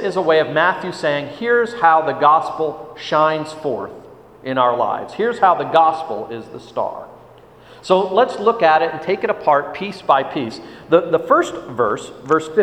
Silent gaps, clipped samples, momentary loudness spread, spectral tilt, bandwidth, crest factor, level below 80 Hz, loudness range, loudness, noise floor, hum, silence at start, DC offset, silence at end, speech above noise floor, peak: none; under 0.1%; 13 LU; -5.5 dB/octave; 10.5 kHz; 18 dB; -58 dBFS; 2 LU; -17 LUFS; -44 dBFS; none; 0 s; under 0.1%; 0 s; 27 dB; 0 dBFS